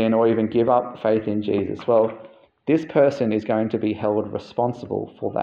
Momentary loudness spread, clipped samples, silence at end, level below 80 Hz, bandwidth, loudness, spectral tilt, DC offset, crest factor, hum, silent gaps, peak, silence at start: 9 LU; under 0.1%; 0 s; -62 dBFS; 7.2 kHz; -22 LUFS; -8.5 dB/octave; under 0.1%; 16 dB; none; none; -6 dBFS; 0 s